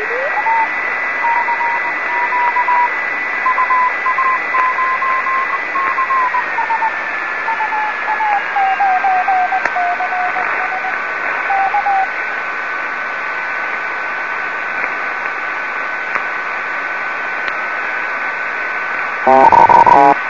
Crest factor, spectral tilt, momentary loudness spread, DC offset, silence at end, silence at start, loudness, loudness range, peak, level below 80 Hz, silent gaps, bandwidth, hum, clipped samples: 16 dB; -4 dB/octave; 6 LU; 0.8%; 0 s; 0 s; -15 LUFS; 5 LU; 0 dBFS; -54 dBFS; none; 7.4 kHz; none; under 0.1%